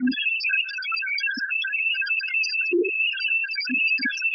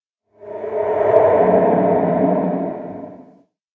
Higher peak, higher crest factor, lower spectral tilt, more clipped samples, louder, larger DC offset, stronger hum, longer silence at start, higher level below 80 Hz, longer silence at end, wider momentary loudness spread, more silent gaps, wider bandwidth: second, -14 dBFS vs 0 dBFS; second, 12 dB vs 18 dB; second, -1.5 dB/octave vs -10.5 dB/octave; neither; second, -22 LUFS vs -16 LUFS; neither; neither; second, 0 s vs 0.4 s; second, -82 dBFS vs -54 dBFS; second, 0 s vs 0.5 s; second, 3 LU vs 19 LU; neither; first, 6.4 kHz vs 3.9 kHz